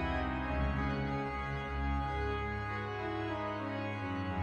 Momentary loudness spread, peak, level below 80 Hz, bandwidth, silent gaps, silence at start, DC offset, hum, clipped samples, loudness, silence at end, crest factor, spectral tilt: 3 LU; -22 dBFS; -42 dBFS; 7.8 kHz; none; 0 s; under 0.1%; none; under 0.1%; -37 LUFS; 0 s; 14 dB; -7.5 dB/octave